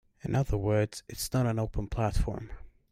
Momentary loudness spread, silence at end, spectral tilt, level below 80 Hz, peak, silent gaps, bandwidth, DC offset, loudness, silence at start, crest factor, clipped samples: 8 LU; 0.2 s; -6.5 dB/octave; -38 dBFS; -16 dBFS; none; 16 kHz; under 0.1%; -31 LUFS; 0.25 s; 16 dB; under 0.1%